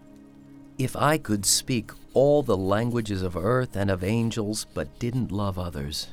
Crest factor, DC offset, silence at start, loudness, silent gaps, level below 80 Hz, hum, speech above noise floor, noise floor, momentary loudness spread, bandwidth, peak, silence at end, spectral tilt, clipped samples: 18 dB; under 0.1%; 0.2 s; -25 LUFS; none; -48 dBFS; none; 24 dB; -49 dBFS; 10 LU; 17.5 kHz; -8 dBFS; 0 s; -4.5 dB/octave; under 0.1%